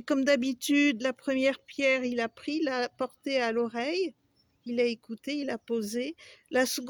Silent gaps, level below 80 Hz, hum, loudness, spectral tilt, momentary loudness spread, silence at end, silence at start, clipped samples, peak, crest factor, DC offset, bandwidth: none; -74 dBFS; none; -29 LUFS; -3 dB/octave; 10 LU; 0 s; 0.05 s; under 0.1%; -14 dBFS; 16 dB; under 0.1%; over 20 kHz